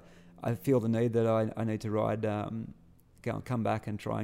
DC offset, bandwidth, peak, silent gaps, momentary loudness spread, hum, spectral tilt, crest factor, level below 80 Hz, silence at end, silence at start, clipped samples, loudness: under 0.1%; 16 kHz; -16 dBFS; none; 11 LU; none; -8 dB/octave; 16 dB; -62 dBFS; 0 s; 0.1 s; under 0.1%; -32 LUFS